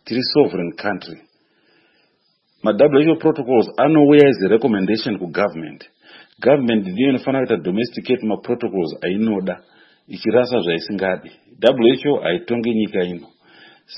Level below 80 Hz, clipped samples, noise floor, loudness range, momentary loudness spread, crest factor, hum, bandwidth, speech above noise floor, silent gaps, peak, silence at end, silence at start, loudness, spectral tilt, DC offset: -62 dBFS; under 0.1%; -64 dBFS; 6 LU; 12 LU; 18 dB; none; 5.8 kHz; 47 dB; none; 0 dBFS; 0 s; 0.05 s; -18 LUFS; -8.5 dB/octave; under 0.1%